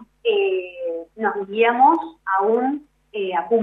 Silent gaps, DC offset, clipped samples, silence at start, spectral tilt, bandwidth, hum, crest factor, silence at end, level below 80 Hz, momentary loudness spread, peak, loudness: none; under 0.1%; under 0.1%; 0 s; -7 dB/octave; 4 kHz; none; 16 dB; 0 s; -66 dBFS; 13 LU; -4 dBFS; -21 LUFS